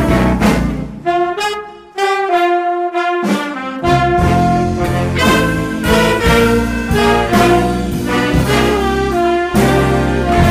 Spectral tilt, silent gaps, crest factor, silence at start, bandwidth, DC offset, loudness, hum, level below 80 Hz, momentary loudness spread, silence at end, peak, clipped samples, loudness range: -5.5 dB/octave; none; 12 dB; 0 s; 16 kHz; under 0.1%; -14 LUFS; none; -24 dBFS; 7 LU; 0 s; -2 dBFS; under 0.1%; 3 LU